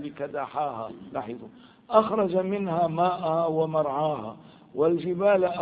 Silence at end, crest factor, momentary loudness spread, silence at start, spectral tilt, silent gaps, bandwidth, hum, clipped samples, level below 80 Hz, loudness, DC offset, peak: 0 s; 22 dB; 13 LU; 0 s; -11 dB/octave; none; 4.9 kHz; none; under 0.1%; -66 dBFS; -26 LUFS; under 0.1%; -6 dBFS